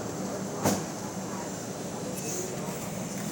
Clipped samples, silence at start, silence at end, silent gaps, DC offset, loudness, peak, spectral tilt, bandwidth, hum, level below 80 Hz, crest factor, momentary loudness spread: under 0.1%; 0 s; 0 s; none; under 0.1%; -33 LUFS; -10 dBFS; -4.5 dB/octave; over 20 kHz; none; -60 dBFS; 22 dB; 7 LU